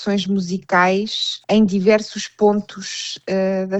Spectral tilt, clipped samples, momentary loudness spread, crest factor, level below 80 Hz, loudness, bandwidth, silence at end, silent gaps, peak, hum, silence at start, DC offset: -5 dB/octave; under 0.1%; 10 LU; 16 dB; -58 dBFS; -19 LUFS; 8.2 kHz; 0 s; none; -4 dBFS; none; 0 s; under 0.1%